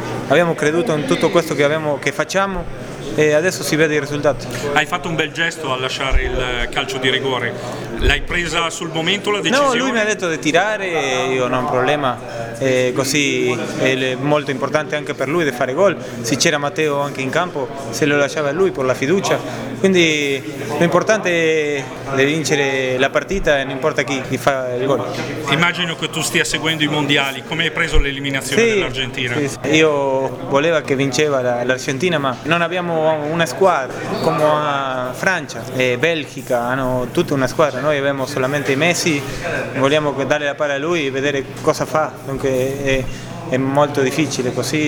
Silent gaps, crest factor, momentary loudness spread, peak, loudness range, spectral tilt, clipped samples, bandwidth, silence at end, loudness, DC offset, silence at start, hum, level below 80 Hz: none; 18 dB; 6 LU; 0 dBFS; 2 LU; -4 dB/octave; under 0.1%; over 20 kHz; 0 s; -17 LUFS; under 0.1%; 0 s; none; -34 dBFS